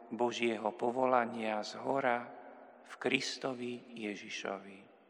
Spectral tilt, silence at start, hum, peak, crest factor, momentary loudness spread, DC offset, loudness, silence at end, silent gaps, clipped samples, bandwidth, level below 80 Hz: -4 dB/octave; 0 s; none; -14 dBFS; 22 dB; 19 LU; under 0.1%; -36 LUFS; 0.25 s; none; under 0.1%; 11 kHz; under -90 dBFS